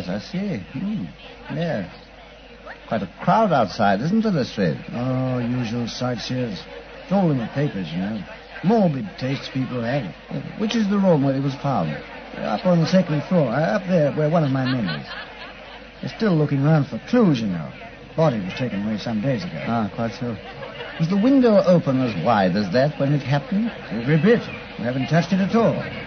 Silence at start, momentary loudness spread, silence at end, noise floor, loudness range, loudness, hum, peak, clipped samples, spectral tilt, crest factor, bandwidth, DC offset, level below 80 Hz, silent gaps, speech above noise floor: 0 s; 15 LU; 0 s; -43 dBFS; 5 LU; -21 LUFS; none; -4 dBFS; under 0.1%; -7.5 dB/octave; 16 dB; 6.6 kHz; under 0.1%; -50 dBFS; none; 22 dB